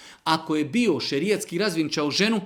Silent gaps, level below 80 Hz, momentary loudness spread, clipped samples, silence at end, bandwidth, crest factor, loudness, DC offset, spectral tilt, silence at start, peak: none; -68 dBFS; 3 LU; under 0.1%; 0 s; 18 kHz; 18 dB; -24 LUFS; under 0.1%; -4 dB/octave; 0 s; -6 dBFS